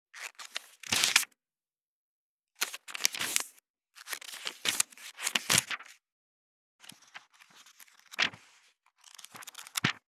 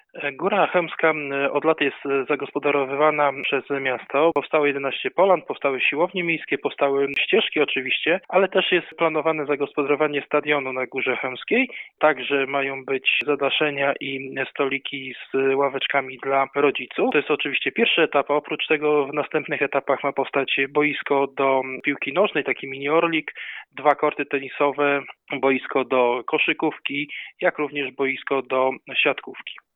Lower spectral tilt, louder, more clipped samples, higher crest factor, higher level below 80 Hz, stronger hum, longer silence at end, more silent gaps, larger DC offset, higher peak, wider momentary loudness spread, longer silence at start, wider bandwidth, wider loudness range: second, 0 dB/octave vs -7.5 dB/octave; second, -31 LUFS vs -22 LUFS; neither; first, 36 dB vs 18 dB; second, -84 dBFS vs -78 dBFS; neither; about the same, 0.1 s vs 0.2 s; first, 1.83-2.39 s, 3.70-3.74 s, 6.12-6.79 s vs none; neither; first, 0 dBFS vs -4 dBFS; first, 25 LU vs 6 LU; about the same, 0.15 s vs 0.15 s; first, 19 kHz vs 4.1 kHz; first, 8 LU vs 2 LU